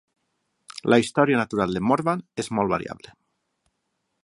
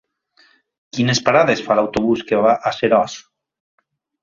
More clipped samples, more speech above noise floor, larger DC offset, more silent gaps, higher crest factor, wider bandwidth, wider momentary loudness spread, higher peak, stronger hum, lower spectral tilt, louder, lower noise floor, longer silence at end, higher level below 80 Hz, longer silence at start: neither; first, 54 dB vs 40 dB; neither; neither; about the same, 22 dB vs 18 dB; first, 11.5 kHz vs 7.6 kHz; first, 14 LU vs 9 LU; about the same, -2 dBFS vs 0 dBFS; neither; about the same, -6 dB/octave vs -5 dB/octave; second, -23 LUFS vs -17 LUFS; first, -76 dBFS vs -56 dBFS; first, 1.3 s vs 1 s; about the same, -58 dBFS vs -54 dBFS; second, 0.75 s vs 0.95 s